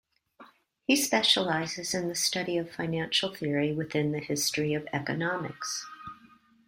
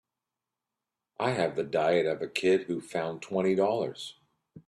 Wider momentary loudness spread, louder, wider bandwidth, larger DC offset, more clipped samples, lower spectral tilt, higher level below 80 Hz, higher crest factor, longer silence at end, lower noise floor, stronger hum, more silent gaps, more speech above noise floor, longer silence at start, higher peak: first, 11 LU vs 8 LU; about the same, -28 LUFS vs -29 LUFS; first, 16 kHz vs 12 kHz; neither; neither; second, -3 dB/octave vs -5.5 dB/octave; about the same, -68 dBFS vs -72 dBFS; about the same, 22 dB vs 18 dB; first, 0.5 s vs 0.1 s; second, -59 dBFS vs -89 dBFS; neither; neither; second, 30 dB vs 60 dB; second, 0.4 s vs 1.2 s; first, -10 dBFS vs -14 dBFS